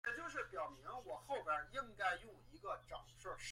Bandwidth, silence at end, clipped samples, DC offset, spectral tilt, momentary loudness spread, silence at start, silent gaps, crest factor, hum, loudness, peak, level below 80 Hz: 16.5 kHz; 0 s; under 0.1%; under 0.1%; -3 dB/octave; 11 LU; 0.05 s; none; 20 dB; none; -46 LUFS; -26 dBFS; -68 dBFS